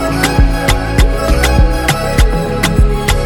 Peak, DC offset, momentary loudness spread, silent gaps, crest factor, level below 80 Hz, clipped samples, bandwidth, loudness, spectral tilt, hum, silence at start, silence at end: 0 dBFS; under 0.1%; 2 LU; none; 10 dB; -14 dBFS; under 0.1%; 18.5 kHz; -13 LUFS; -5 dB/octave; none; 0 s; 0 s